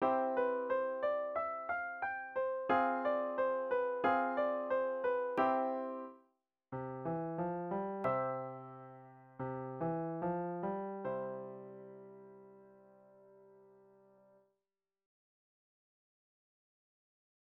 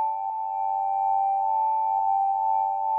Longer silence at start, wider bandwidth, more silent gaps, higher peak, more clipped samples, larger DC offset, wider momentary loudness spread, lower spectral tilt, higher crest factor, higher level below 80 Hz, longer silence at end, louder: about the same, 0 s vs 0 s; first, 5.2 kHz vs 2.8 kHz; neither; second, -20 dBFS vs -16 dBFS; neither; neither; first, 19 LU vs 4 LU; first, -5.5 dB/octave vs 0 dB/octave; first, 20 dB vs 8 dB; first, -78 dBFS vs under -90 dBFS; first, 4 s vs 0 s; second, -37 LUFS vs -25 LUFS